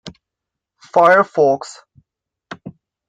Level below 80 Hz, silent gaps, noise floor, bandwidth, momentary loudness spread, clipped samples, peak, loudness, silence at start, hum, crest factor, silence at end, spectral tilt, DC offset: -62 dBFS; none; -83 dBFS; 9.4 kHz; 24 LU; under 0.1%; -2 dBFS; -14 LUFS; 0.05 s; none; 18 dB; 0.4 s; -5 dB/octave; under 0.1%